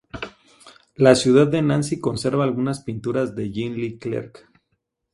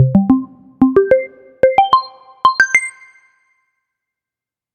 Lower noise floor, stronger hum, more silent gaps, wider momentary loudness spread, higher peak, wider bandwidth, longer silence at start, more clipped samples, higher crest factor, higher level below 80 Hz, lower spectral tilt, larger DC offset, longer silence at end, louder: second, -74 dBFS vs -88 dBFS; neither; neither; about the same, 16 LU vs 17 LU; about the same, 0 dBFS vs 0 dBFS; first, 11.5 kHz vs 9.2 kHz; first, 0.15 s vs 0 s; neither; about the same, 20 dB vs 16 dB; second, -54 dBFS vs -48 dBFS; about the same, -6 dB/octave vs -6 dB/octave; neither; second, 0.85 s vs 1.85 s; second, -21 LUFS vs -14 LUFS